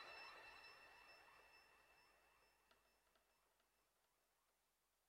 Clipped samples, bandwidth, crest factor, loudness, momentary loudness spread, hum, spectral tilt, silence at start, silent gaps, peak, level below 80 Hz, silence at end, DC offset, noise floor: under 0.1%; 15.5 kHz; 22 dB; -63 LUFS; 10 LU; none; -1.5 dB/octave; 0 s; none; -46 dBFS; under -90 dBFS; 0 s; under 0.1%; -87 dBFS